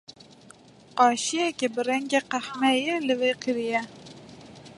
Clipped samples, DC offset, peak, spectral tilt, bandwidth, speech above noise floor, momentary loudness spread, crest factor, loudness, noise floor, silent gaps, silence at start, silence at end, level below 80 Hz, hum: under 0.1%; under 0.1%; -6 dBFS; -2.5 dB/octave; 11.5 kHz; 27 dB; 23 LU; 22 dB; -25 LUFS; -52 dBFS; none; 0.1 s; 0.05 s; -70 dBFS; none